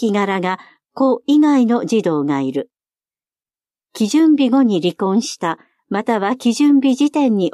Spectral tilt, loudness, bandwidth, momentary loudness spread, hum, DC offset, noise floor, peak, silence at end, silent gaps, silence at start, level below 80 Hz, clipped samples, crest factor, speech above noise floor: -5.5 dB/octave; -16 LUFS; 12.5 kHz; 10 LU; none; under 0.1%; under -90 dBFS; -4 dBFS; 0.05 s; none; 0 s; -72 dBFS; under 0.1%; 12 dB; over 75 dB